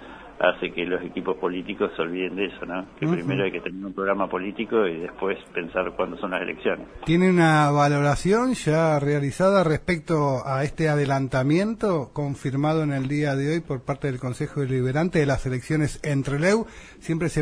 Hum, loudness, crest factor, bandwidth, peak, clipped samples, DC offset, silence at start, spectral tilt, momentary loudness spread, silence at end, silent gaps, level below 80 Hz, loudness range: none; -24 LUFS; 18 dB; 11 kHz; -6 dBFS; under 0.1%; under 0.1%; 0 s; -6.5 dB/octave; 9 LU; 0 s; none; -46 dBFS; 6 LU